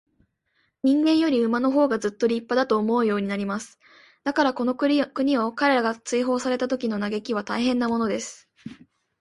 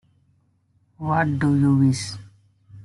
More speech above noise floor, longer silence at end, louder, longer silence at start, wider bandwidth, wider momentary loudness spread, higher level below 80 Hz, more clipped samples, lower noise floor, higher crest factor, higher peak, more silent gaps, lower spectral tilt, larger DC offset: first, 48 dB vs 44 dB; first, 0.45 s vs 0.05 s; about the same, -23 LUFS vs -21 LUFS; second, 0.85 s vs 1 s; about the same, 11.5 kHz vs 11.5 kHz; second, 10 LU vs 15 LU; second, -64 dBFS vs -54 dBFS; neither; first, -70 dBFS vs -64 dBFS; about the same, 16 dB vs 14 dB; about the same, -6 dBFS vs -8 dBFS; neither; second, -5 dB/octave vs -6.5 dB/octave; neither